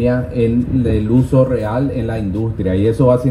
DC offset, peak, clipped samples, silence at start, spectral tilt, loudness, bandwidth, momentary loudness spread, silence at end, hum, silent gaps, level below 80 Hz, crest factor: under 0.1%; -2 dBFS; under 0.1%; 0 s; -9.5 dB/octave; -16 LUFS; 11.5 kHz; 6 LU; 0 s; none; none; -32 dBFS; 12 dB